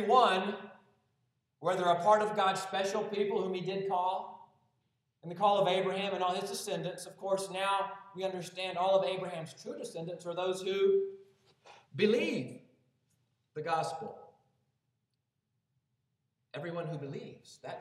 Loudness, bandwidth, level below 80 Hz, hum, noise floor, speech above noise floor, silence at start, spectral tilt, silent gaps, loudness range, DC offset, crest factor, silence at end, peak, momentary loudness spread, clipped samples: -33 LUFS; 14 kHz; -88 dBFS; none; -84 dBFS; 51 dB; 0 s; -4.5 dB/octave; none; 11 LU; under 0.1%; 22 dB; 0 s; -12 dBFS; 17 LU; under 0.1%